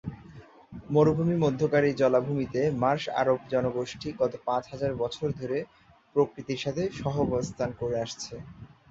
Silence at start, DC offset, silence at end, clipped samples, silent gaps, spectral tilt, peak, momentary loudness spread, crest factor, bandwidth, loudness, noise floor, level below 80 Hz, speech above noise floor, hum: 0.05 s; under 0.1%; 0.25 s; under 0.1%; none; -6.5 dB/octave; -8 dBFS; 14 LU; 20 dB; 8 kHz; -28 LUFS; -50 dBFS; -56 dBFS; 23 dB; none